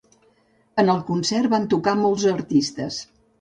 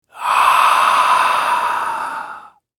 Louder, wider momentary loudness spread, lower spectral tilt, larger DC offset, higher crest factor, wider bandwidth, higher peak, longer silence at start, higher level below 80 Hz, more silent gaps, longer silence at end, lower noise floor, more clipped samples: second, -21 LUFS vs -14 LUFS; second, 9 LU vs 13 LU; first, -5 dB/octave vs 0 dB/octave; neither; about the same, 16 dB vs 16 dB; second, 10 kHz vs over 20 kHz; second, -6 dBFS vs 0 dBFS; first, 0.75 s vs 0.15 s; about the same, -60 dBFS vs -62 dBFS; neither; about the same, 0.35 s vs 0.4 s; first, -61 dBFS vs -37 dBFS; neither